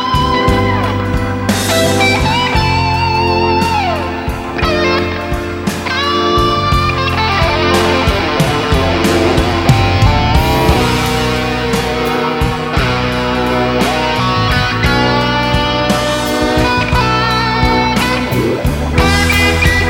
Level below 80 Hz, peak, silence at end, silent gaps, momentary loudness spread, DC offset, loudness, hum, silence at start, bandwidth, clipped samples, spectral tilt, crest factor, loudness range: -22 dBFS; 0 dBFS; 0 s; none; 4 LU; under 0.1%; -13 LUFS; none; 0 s; 16.5 kHz; under 0.1%; -5 dB/octave; 12 dB; 2 LU